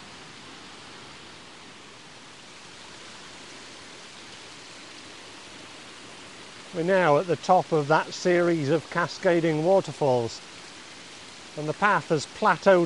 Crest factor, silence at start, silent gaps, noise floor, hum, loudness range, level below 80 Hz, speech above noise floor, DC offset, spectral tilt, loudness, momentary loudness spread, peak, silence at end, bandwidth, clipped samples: 20 dB; 0 s; none; -47 dBFS; none; 20 LU; -68 dBFS; 24 dB; 0.1%; -5.5 dB/octave; -24 LUFS; 21 LU; -6 dBFS; 0 s; 11.5 kHz; under 0.1%